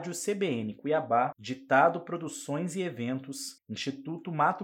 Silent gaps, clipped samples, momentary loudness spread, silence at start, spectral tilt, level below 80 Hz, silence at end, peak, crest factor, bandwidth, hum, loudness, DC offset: none; under 0.1%; 14 LU; 0 s; -5 dB/octave; -80 dBFS; 0 s; -10 dBFS; 20 dB; 17 kHz; none; -31 LUFS; under 0.1%